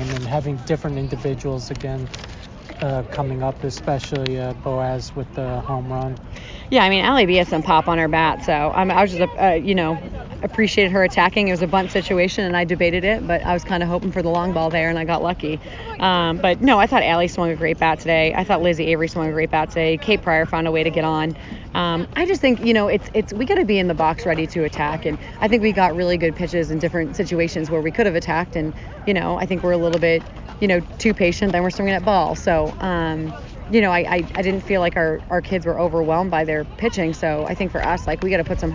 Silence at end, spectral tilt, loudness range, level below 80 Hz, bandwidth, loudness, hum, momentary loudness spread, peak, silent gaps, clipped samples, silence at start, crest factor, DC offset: 0 s; -6 dB/octave; 7 LU; -36 dBFS; 7.6 kHz; -20 LUFS; none; 10 LU; -2 dBFS; none; under 0.1%; 0 s; 18 dB; under 0.1%